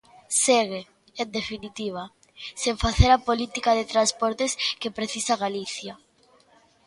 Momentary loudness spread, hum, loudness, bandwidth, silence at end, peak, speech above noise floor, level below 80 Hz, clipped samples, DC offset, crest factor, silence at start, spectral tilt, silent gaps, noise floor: 17 LU; none; -24 LUFS; 11.5 kHz; 0.9 s; -2 dBFS; 35 dB; -36 dBFS; under 0.1%; under 0.1%; 24 dB; 0.3 s; -3.5 dB/octave; none; -59 dBFS